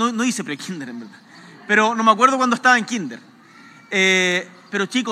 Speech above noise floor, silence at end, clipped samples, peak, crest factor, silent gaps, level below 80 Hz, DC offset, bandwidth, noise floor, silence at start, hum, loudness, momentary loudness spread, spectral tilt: 27 dB; 0 s; under 0.1%; 0 dBFS; 20 dB; none; -88 dBFS; under 0.1%; 14.5 kHz; -46 dBFS; 0 s; none; -18 LUFS; 17 LU; -3 dB/octave